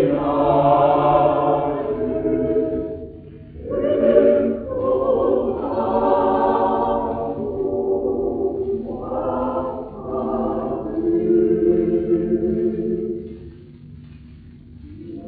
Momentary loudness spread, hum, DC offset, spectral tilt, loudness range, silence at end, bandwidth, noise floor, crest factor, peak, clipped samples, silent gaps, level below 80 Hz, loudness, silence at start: 14 LU; none; under 0.1%; -7.5 dB/octave; 5 LU; 0 s; 4.5 kHz; -42 dBFS; 18 dB; -2 dBFS; under 0.1%; none; -44 dBFS; -20 LUFS; 0 s